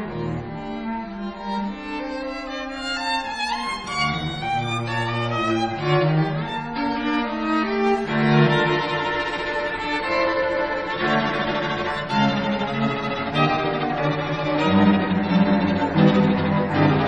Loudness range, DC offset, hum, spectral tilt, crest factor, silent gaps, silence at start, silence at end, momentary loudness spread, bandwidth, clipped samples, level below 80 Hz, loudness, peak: 6 LU; under 0.1%; none; -6.5 dB/octave; 18 dB; none; 0 s; 0 s; 11 LU; 10 kHz; under 0.1%; -46 dBFS; -22 LUFS; -4 dBFS